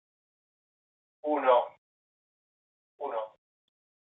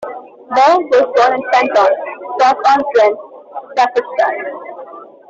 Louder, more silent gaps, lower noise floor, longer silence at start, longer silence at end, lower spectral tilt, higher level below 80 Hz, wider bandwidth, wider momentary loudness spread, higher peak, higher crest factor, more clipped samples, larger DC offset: second, -29 LUFS vs -13 LUFS; first, 1.78-2.99 s vs none; first, under -90 dBFS vs -34 dBFS; first, 1.25 s vs 0 s; first, 0.85 s vs 0.25 s; first, -6 dB/octave vs -3 dB/octave; second, under -90 dBFS vs -62 dBFS; second, 4 kHz vs 7.8 kHz; second, 16 LU vs 20 LU; second, -12 dBFS vs -2 dBFS; first, 22 dB vs 12 dB; neither; neither